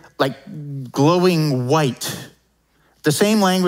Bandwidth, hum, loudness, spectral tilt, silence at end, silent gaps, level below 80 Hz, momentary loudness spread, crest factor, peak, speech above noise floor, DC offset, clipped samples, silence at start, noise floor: 16.5 kHz; none; -18 LUFS; -5.5 dB/octave; 0 s; none; -64 dBFS; 16 LU; 16 dB; -2 dBFS; 43 dB; under 0.1%; under 0.1%; 0.2 s; -61 dBFS